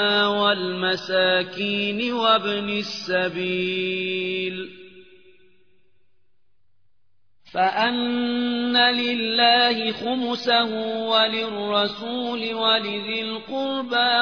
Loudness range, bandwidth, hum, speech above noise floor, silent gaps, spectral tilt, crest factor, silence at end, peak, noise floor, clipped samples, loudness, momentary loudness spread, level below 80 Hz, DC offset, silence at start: 10 LU; 5.4 kHz; none; 53 dB; none; -4.5 dB/octave; 18 dB; 0 s; -6 dBFS; -75 dBFS; under 0.1%; -22 LUFS; 9 LU; -68 dBFS; 0.2%; 0 s